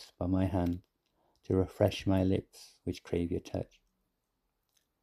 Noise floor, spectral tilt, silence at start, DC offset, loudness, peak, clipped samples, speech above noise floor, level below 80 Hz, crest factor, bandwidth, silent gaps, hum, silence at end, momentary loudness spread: -82 dBFS; -7.5 dB/octave; 0 s; under 0.1%; -33 LUFS; -12 dBFS; under 0.1%; 50 dB; -56 dBFS; 22 dB; 14.5 kHz; none; none; 1.4 s; 13 LU